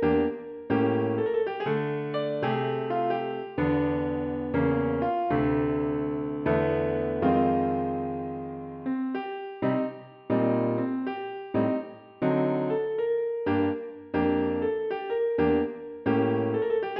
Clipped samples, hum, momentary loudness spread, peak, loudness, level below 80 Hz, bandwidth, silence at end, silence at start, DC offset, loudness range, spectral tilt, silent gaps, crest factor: under 0.1%; none; 8 LU; -12 dBFS; -28 LUFS; -52 dBFS; 5.4 kHz; 0 s; 0 s; under 0.1%; 3 LU; -10.5 dB/octave; none; 16 dB